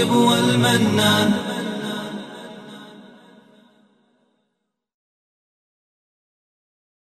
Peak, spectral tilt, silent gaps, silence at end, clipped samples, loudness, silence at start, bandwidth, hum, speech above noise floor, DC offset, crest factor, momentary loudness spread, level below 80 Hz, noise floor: -6 dBFS; -4.5 dB/octave; none; 4 s; under 0.1%; -18 LUFS; 0 s; 13.5 kHz; none; 59 dB; under 0.1%; 18 dB; 22 LU; -62 dBFS; -76 dBFS